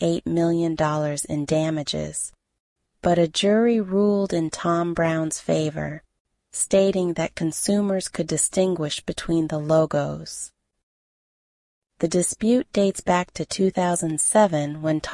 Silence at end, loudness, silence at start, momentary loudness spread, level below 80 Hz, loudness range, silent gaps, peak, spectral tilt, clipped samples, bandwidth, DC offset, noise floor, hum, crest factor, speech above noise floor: 0 s; -22 LUFS; 0 s; 9 LU; -52 dBFS; 4 LU; 2.60-2.76 s, 6.20-6.25 s, 10.83-11.82 s; -6 dBFS; -5 dB/octave; under 0.1%; 11.5 kHz; under 0.1%; under -90 dBFS; none; 18 dB; over 68 dB